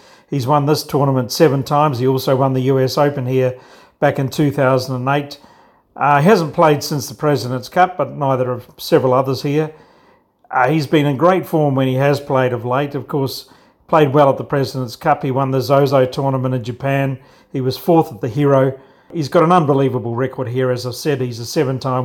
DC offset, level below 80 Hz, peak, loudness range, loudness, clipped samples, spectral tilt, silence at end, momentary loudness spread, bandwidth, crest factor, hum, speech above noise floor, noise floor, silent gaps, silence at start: under 0.1%; -56 dBFS; 0 dBFS; 2 LU; -16 LUFS; under 0.1%; -6.5 dB/octave; 0 s; 8 LU; 17.5 kHz; 16 dB; none; 37 dB; -53 dBFS; none; 0.3 s